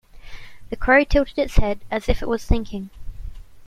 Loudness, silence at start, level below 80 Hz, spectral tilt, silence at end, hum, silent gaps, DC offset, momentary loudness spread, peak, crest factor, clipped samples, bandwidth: -21 LUFS; 0.15 s; -26 dBFS; -6.5 dB/octave; 0 s; none; none; under 0.1%; 24 LU; -2 dBFS; 18 dB; under 0.1%; 12.5 kHz